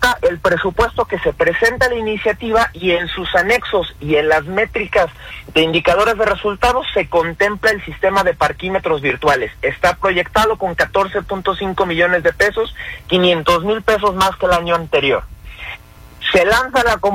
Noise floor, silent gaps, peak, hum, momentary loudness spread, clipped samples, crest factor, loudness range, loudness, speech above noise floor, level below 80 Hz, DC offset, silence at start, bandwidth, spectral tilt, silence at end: -37 dBFS; none; -2 dBFS; none; 6 LU; under 0.1%; 14 dB; 1 LU; -16 LUFS; 22 dB; -36 dBFS; under 0.1%; 0 s; 16.5 kHz; -4.5 dB/octave; 0 s